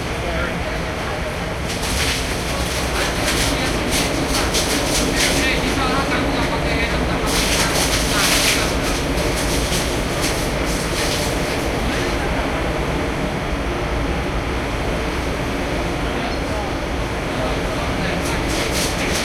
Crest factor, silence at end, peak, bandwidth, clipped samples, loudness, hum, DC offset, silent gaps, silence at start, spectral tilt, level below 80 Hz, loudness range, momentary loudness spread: 18 dB; 0 s; -2 dBFS; 16.5 kHz; under 0.1%; -20 LUFS; none; under 0.1%; none; 0 s; -3.5 dB/octave; -28 dBFS; 5 LU; 6 LU